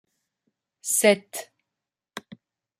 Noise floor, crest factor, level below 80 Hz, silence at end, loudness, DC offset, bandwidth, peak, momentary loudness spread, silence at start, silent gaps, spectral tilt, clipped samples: -87 dBFS; 26 dB; -80 dBFS; 0.6 s; -21 LUFS; under 0.1%; 16 kHz; -4 dBFS; 23 LU; 0.85 s; none; -2.5 dB/octave; under 0.1%